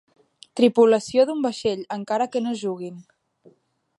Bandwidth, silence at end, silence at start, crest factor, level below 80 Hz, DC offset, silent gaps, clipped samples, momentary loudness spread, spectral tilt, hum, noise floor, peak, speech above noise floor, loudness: 11.5 kHz; 0.95 s; 0.55 s; 18 dB; -68 dBFS; under 0.1%; none; under 0.1%; 14 LU; -5 dB/octave; none; -62 dBFS; -4 dBFS; 40 dB; -22 LUFS